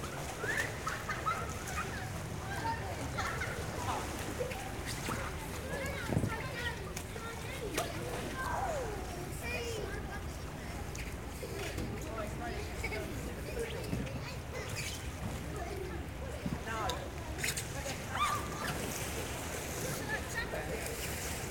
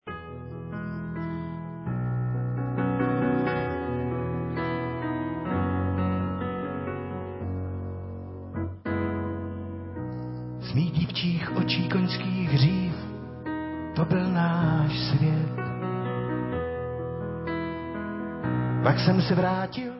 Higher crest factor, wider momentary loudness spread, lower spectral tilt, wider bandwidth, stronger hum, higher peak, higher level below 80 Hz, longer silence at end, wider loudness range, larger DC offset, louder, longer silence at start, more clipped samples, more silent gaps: about the same, 20 dB vs 20 dB; second, 6 LU vs 12 LU; second, -4 dB/octave vs -11 dB/octave; first, 19.5 kHz vs 5.8 kHz; neither; second, -18 dBFS vs -6 dBFS; about the same, -48 dBFS vs -46 dBFS; about the same, 0 s vs 0 s; second, 3 LU vs 6 LU; neither; second, -38 LUFS vs -28 LUFS; about the same, 0 s vs 0.05 s; neither; neither